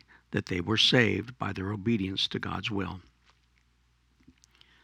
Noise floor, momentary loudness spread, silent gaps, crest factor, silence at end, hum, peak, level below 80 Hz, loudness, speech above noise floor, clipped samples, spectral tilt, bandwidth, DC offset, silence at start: -68 dBFS; 13 LU; none; 24 dB; 1.8 s; none; -8 dBFS; -60 dBFS; -28 LUFS; 39 dB; under 0.1%; -4.5 dB/octave; 13.5 kHz; under 0.1%; 0.3 s